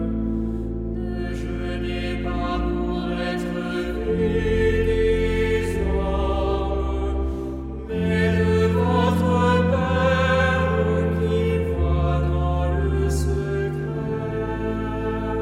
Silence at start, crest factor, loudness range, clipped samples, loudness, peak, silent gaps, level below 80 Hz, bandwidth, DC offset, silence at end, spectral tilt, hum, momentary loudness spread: 0 s; 14 dB; 6 LU; under 0.1%; -23 LUFS; -8 dBFS; none; -28 dBFS; 13 kHz; under 0.1%; 0 s; -7.5 dB/octave; none; 8 LU